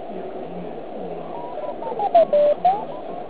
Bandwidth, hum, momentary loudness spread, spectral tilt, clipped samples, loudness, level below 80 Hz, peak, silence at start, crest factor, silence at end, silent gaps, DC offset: 4 kHz; none; 16 LU; -9.5 dB/octave; under 0.1%; -22 LUFS; -60 dBFS; -6 dBFS; 0 s; 16 dB; 0 s; none; 1%